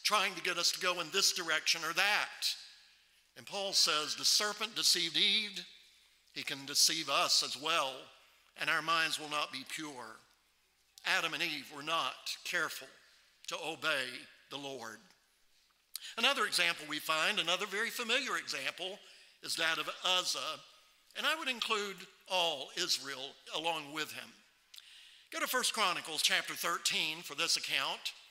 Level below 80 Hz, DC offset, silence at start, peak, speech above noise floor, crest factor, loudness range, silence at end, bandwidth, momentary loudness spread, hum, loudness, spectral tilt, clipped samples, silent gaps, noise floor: -86 dBFS; under 0.1%; 0 s; -12 dBFS; 38 dB; 24 dB; 6 LU; 0.05 s; 16 kHz; 16 LU; none; -33 LUFS; 0 dB/octave; under 0.1%; none; -73 dBFS